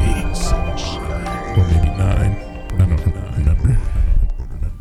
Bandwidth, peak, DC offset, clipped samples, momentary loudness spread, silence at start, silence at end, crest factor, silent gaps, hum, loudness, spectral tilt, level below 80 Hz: 12.5 kHz; -2 dBFS; under 0.1%; under 0.1%; 8 LU; 0 s; 0 s; 14 dB; none; none; -19 LUFS; -6.5 dB/octave; -18 dBFS